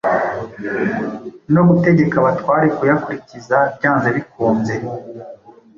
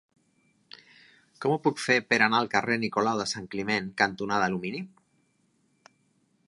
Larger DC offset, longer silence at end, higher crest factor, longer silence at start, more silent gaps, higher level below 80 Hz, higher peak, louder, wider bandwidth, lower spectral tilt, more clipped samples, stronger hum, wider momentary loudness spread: neither; second, 0.4 s vs 1.6 s; second, 14 dB vs 24 dB; second, 0.05 s vs 1.4 s; neither; first, -52 dBFS vs -68 dBFS; first, -2 dBFS vs -6 dBFS; first, -16 LUFS vs -26 LUFS; second, 7.2 kHz vs 11.5 kHz; first, -9 dB/octave vs -4 dB/octave; neither; neither; first, 16 LU vs 10 LU